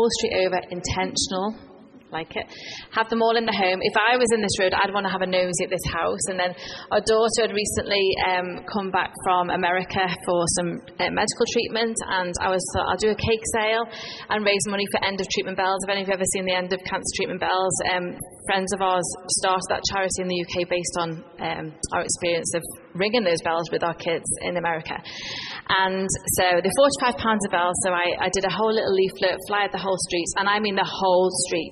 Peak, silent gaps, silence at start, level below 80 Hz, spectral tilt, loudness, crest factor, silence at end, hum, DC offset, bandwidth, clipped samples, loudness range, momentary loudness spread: -6 dBFS; none; 0 s; -50 dBFS; -3 dB/octave; -23 LUFS; 18 dB; 0 s; none; under 0.1%; 11.5 kHz; under 0.1%; 4 LU; 9 LU